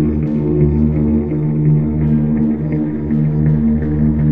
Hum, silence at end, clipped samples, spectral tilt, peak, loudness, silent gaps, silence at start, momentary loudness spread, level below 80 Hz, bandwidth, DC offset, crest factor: none; 0 s; under 0.1%; -13 dB/octave; -2 dBFS; -15 LUFS; none; 0 s; 3 LU; -26 dBFS; 2.7 kHz; 1%; 12 dB